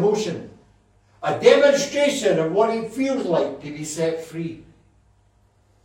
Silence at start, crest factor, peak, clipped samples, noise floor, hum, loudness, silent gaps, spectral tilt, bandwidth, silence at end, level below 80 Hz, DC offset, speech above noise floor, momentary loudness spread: 0 s; 22 dB; 0 dBFS; under 0.1%; -59 dBFS; 50 Hz at -55 dBFS; -21 LUFS; none; -4.5 dB/octave; 16.5 kHz; 1.25 s; -60 dBFS; under 0.1%; 39 dB; 16 LU